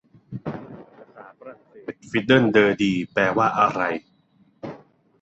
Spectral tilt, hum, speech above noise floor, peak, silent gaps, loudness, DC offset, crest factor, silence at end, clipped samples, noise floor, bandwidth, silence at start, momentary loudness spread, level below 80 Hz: -6.5 dB/octave; none; 39 dB; -2 dBFS; none; -20 LUFS; under 0.1%; 22 dB; 0.45 s; under 0.1%; -60 dBFS; 8.2 kHz; 0.3 s; 22 LU; -60 dBFS